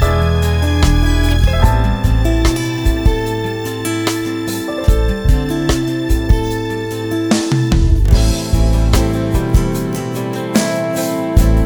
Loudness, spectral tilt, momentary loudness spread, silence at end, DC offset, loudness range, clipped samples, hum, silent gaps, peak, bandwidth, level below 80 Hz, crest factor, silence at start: -16 LUFS; -6 dB/octave; 7 LU; 0 s; 0.2%; 2 LU; under 0.1%; none; none; 0 dBFS; over 20 kHz; -16 dBFS; 14 dB; 0 s